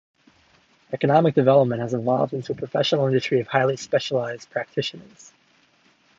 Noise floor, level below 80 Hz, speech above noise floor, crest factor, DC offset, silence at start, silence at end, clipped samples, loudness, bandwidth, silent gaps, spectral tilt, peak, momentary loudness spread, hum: -61 dBFS; -66 dBFS; 39 dB; 20 dB; under 0.1%; 0.9 s; 1.2 s; under 0.1%; -22 LUFS; 7.8 kHz; none; -6 dB/octave; -4 dBFS; 11 LU; none